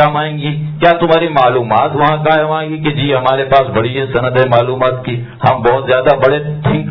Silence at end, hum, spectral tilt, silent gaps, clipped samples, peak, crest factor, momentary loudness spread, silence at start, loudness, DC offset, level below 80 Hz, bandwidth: 0 s; none; -9 dB/octave; none; 0.3%; 0 dBFS; 12 dB; 6 LU; 0 s; -12 LUFS; under 0.1%; -40 dBFS; 5.4 kHz